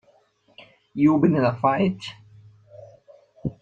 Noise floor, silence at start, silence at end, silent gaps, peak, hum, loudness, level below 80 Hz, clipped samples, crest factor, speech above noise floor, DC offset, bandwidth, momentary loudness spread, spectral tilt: -61 dBFS; 0.95 s; 0.1 s; none; -6 dBFS; none; -21 LUFS; -58 dBFS; under 0.1%; 18 dB; 40 dB; under 0.1%; 7.8 kHz; 18 LU; -8.5 dB/octave